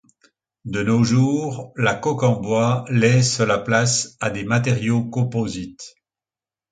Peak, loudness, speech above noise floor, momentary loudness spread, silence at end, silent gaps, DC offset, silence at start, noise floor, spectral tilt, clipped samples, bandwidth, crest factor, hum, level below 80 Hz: -2 dBFS; -20 LUFS; over 71 dB; 12 LU; 0.8 s; none; under 0.1%; 0.65 s; under -90 dBFS; -5 dB/octave; under 0.1%; 9.4 kHz; 18 dB; none; -52 dBFS